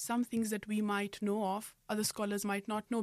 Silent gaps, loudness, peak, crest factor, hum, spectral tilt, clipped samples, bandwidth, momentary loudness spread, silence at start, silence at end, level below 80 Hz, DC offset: none; -36 LUFS; -22 dBFS; 14 dB; none; -4 dB/octave; under 0.1%; 15.5 kHz; 3 LU; 0 s; 0 s; -72 dBFS; under 0.1%